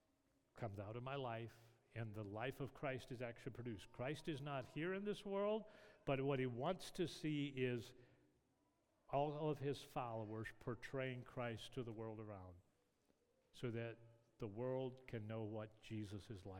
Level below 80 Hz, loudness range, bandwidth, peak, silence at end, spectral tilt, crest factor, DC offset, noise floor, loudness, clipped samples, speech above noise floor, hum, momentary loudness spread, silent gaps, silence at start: -72 dBFS; 6 LU; 17.5 kHz; -28 dBFS; 0 s; -6.5 dB/octave; 20 dB; under 0.1%; -82 dBFS; -48 LUFS; under 0.1%; 35 dB; none; 10 LU; none; 0.55 s